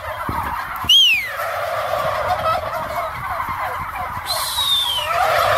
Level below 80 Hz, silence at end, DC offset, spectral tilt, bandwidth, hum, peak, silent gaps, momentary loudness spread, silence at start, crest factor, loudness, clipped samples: -42 dBFS; 0 s; under 0.1%; -1.5 dB/octave; 16 kHz; none; -4 dBFS; none; 13 LU; 0 s; 16 dB; -18 LUFS; under 0.1%